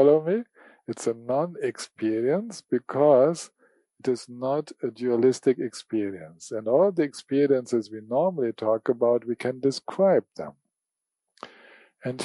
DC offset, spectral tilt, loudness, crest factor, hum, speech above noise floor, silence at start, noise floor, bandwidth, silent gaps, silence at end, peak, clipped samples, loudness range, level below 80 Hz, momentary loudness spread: under 0.1%; -6 dB/octave; -25 LUFS; 18 dB; none; 62 dB; 0 s; -86 dBFS; 11.5 kHz; none; 0 s; -6 dBFS; under 0.1%; 3 LU; -78 dBFS; 15 LU